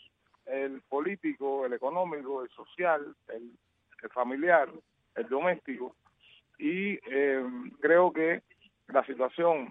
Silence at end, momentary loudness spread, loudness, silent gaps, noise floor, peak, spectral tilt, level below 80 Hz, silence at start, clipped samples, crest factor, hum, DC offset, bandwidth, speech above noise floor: 0 s; 15 LU; -30 LUFS; none; -63 dBFS; -10 dBFS; -9 dB/octave; -82 dBFS; 0.45 s; under 0.1%; 22 dB; none; under 0.1%; 3.9 kHz; 33 dB